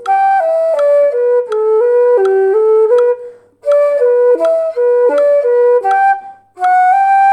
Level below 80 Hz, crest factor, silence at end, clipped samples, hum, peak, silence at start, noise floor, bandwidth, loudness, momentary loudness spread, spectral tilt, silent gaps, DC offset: -70 dBFS; 8 dB; 0 s; under 0.1%; none; -2 dBFS; 0 s; -32 dBFS; 9.4 kHz; -11 LUFS; 4 LU; -3.5 dB/octave; none; under 0.1%